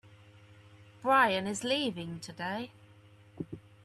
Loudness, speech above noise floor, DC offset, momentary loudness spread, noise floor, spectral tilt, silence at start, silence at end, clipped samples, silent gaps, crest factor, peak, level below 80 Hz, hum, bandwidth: -31 LUFS; 27 dB; under 0.1%; 19 LU; -58 dBFS; -4 dB/octave; 0.05 s; 0.25 s; under 0.1%; none; 20 dB; -14 dBFS; -70 dBFS; none; 13.5 kHz